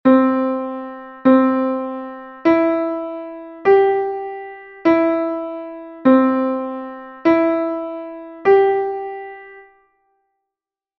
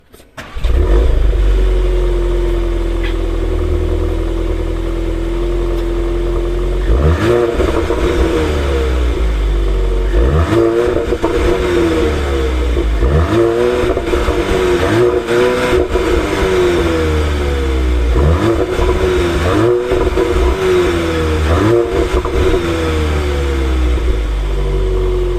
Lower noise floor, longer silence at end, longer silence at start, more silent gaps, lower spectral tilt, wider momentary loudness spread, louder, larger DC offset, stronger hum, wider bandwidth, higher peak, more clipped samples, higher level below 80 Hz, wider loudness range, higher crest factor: first, -87 dBFS vs -34 dBFS; first, 1.4 s vs 0 s; second, 0.05 s vs 0.35 s; neither; first, -8 dB/octave vs -6.5 dB/octave; first, 18 LU vs 6 LU; second, -18 LUFS vs -15 LUFS; neither; neither; second, 5.8 kHz vs 14 kHz; about the same, -2 dBFS vs 0 dBFS; neither; second, -60 dBFS vs -16 dBFS; about the same, 2 LU vs 4 LU; about the same, 16 dB vs 12 dB